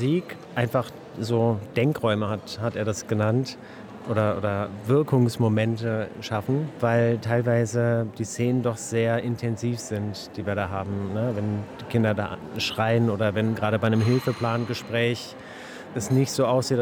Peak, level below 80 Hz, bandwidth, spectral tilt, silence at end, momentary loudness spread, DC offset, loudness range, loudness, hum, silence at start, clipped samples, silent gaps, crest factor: -8 dBFS; -62 dBFS; 17 kHz; -6.5 dB/octave; 0 s; 10 LU; under 0.1%; 3 LU; -25 LUFS; none; 0 s; under 0.1%; none; 16 dB